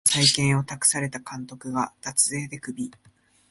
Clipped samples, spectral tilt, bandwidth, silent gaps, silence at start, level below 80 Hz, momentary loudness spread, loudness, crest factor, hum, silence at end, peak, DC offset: under 0.1%; -2.5 dB/octave; 12 kHz; none; 0.05 s; -60 dBFS; 17 LU; -23 LUFS; 22 dB; none; 0.6 s; -4 dBFS; under 0.1%